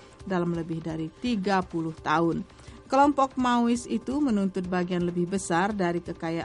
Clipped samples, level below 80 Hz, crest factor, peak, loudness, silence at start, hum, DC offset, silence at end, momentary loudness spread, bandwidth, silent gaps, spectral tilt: under 0.1%; -52 dBFS; 16 dB; -10 dBFS; -27 LUFS; 0 s; none; under 0.1%; 0 s; 10 LU; 11.5 kHz; none; -6 dB/octave